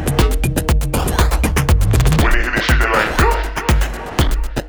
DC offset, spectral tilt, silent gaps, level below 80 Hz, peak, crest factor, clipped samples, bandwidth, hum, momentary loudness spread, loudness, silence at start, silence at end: under 0.1%; -5 dB/octave; none; -18 dBFS; 0 dBFS; 14 dB; under 0.1%; over 20 kHz; none; 5 LU; -16 LUFS; 0 s; 0 s